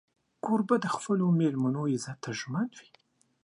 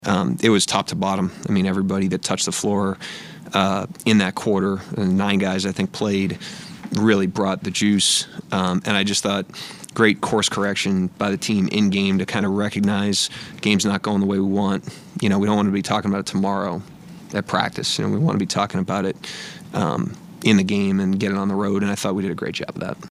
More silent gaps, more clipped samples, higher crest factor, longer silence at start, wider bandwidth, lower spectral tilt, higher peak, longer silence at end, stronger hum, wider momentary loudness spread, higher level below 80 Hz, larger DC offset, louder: neither; neither; about the same, 18 dB vs 20 dB; first, 0.45 s vs 0 s; second, 11 kHz vs 13.5 kHz; first, -6.5 dB/octave vs -4.5 dB/octave; second, -12 dBFS vs 0 dBFS; first, 0.6 s vs 0 s; neither; about the same, 10 LU vs 10 LU; second, -76 dBFS vs -58 dBFS; neither; second, -30 LUFS vs -21 LUFS